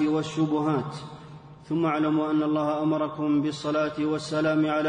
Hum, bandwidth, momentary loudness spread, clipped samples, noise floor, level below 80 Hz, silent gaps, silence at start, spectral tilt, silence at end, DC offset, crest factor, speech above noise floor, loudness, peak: none; 9.6 kHz; 11 LU; under 0.1%; -45 dBFS; -64 dBFS; none; 0 s; -7 dB/octave; 0 s; under 0.1%; 12 dB; 20 dB; -26 LUFS; -14 dBFS